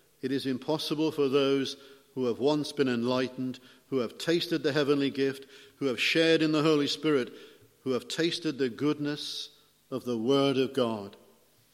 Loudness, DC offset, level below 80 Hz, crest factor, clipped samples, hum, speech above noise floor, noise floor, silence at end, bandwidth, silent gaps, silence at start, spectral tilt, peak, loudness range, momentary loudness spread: -29 LUFS; under 0.1%; -76 dBFS; 18 dB; under 0.1%; none; 34 dB; -62 dBFS; 0.6 s; 15.5 kHz; none; 0.25 s; -5 dB/octave; -10 dBFS; 4 LU; 13 LU